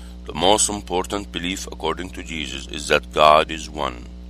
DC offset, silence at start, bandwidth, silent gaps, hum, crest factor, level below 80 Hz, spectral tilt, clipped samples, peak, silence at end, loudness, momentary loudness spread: under 0.1%; 0 s; 15.5 kHz; none; 60 Hz at -35 dBFS; 22 dB; -38 dBFS; -2.5 dB/octave; under 0.1%; 0 dBFS; 0 s; -21 LUFS; 14 LU